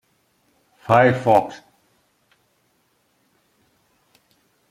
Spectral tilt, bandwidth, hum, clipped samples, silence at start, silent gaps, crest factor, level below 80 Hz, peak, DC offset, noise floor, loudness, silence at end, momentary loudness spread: -7 dB/octave; 16 kHz; none; under 0.1%; 0.9 s; none; 22 dB; -62 dBFS; -2 dBFS; under 0.1%; -65 dBFS; -17 LUFS; 3.15 s; 26 LU